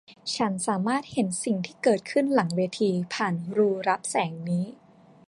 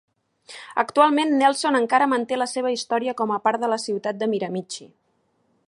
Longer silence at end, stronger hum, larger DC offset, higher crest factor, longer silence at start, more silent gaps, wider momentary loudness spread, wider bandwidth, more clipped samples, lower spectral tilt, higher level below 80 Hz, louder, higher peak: second, 0.55 s vs 0.8 s; neither; neither; about the same, 18 dB vs 20 dB; second, 0.1 s vs 0.5 s; neither; second, 5 LU vs 12 LU; about the same, 11.5 kHz vs 11.5 kHz; neither; about the same, -5 dB/octave vs -4 dB/octave; first, -70 dBFS vs -76 dBFS; second, -26 LUFS vs -22 LUFS; second, -8 dBFS vs -2 dBFS